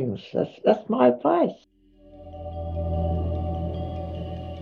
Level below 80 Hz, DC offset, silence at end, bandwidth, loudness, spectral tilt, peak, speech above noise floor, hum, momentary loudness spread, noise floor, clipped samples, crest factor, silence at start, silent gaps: -38 dBFS; under 0.1%; 0 s; 5.2 kHz; -25 LUFS; -9.5 dB/octave; -4 dBFS; 27 dB; none; 15 LU; -49 dBFS; under 0.1%; 22 dB; 0 s; none